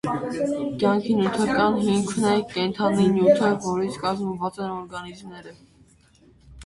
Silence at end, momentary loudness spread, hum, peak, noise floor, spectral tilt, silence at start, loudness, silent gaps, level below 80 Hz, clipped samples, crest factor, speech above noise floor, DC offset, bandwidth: 0 s; 16 LU; none; -4 dBFS; -56 dBFS; -6 dB/octave; 0.05 s; -23 LUFS; none; -56 dBFS; under 0.1%; 18 dB; 33 dB; under 0.1%; 11.5 kHz